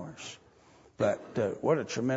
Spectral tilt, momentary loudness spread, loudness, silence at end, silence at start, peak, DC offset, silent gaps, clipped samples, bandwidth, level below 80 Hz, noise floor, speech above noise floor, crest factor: -5.5 dB/octave; 15 LU; -31 LUFS; 0 s; 0 s; -14 dBFS; under 0.1%; none; under 0.1%; 8 kHz; -68 dBFS; -59 dBFS; 30 dB; 18 dB